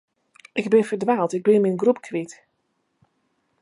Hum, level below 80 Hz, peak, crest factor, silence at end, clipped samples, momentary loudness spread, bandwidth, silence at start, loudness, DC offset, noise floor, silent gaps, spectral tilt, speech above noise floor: none; -74 dBFS; -4 dBFS; 18 dB; 1.3 s; under 0.1%; 12 LU; 11 kHz; 0.55 s; -21 LUFS; under 0.1%; -72 dBFS; none; -6.5 dB/octave; 52 dB